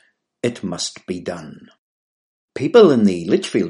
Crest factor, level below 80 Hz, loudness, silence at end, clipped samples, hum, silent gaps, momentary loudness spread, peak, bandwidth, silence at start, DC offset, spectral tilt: 18 dB; -62 dBFS; -17 LUFS; 0 s; under 0.1%; none; 1.78-2.48 s; 18 LU; 0 dBFS; 11.5 kHz; 0.45 s; under 0.1%; -5.5 dB/octave